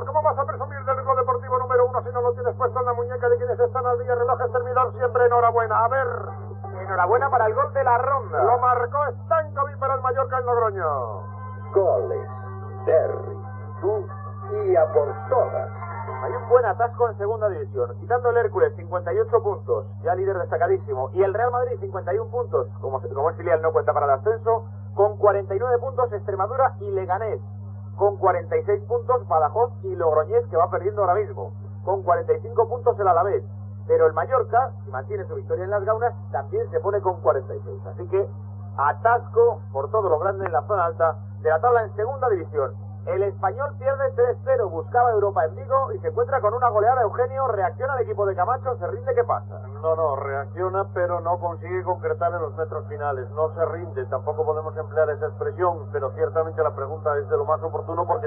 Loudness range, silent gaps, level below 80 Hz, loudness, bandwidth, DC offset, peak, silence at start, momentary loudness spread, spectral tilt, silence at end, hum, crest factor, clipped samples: 4 LU; none; -66 dBFS; -23 LUFS; 3.3 kHz; under 0.1%; -4 dBFS; 0 s; 9 LU; -8.5 dB/octave; 0 s; none; 20 dB; under 0.1%